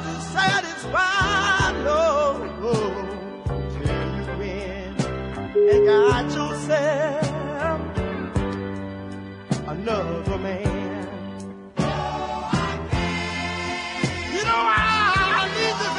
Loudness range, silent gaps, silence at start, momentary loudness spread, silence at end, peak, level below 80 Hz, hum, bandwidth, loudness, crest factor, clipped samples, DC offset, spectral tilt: 6 LU; none; 0 s; 12 LU; 0 s; -8 dBFS; -40 dBFS; none; 11 kHz; -23 LUFS; 16 dB; under 0.1%; under 0.1%; -5 dB/octave